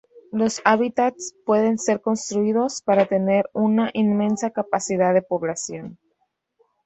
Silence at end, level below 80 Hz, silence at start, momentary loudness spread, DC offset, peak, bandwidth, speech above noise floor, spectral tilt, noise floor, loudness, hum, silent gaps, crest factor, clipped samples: 0.9 s; -66 dBFS; 0.35 s; 8 LU; under 0.1%; -2 dBFS; 8.2 kHz; 51 dB; -5 dB/octave; -72 dBFS; -21 LUFS; none; none; 20 dB; under 0.1%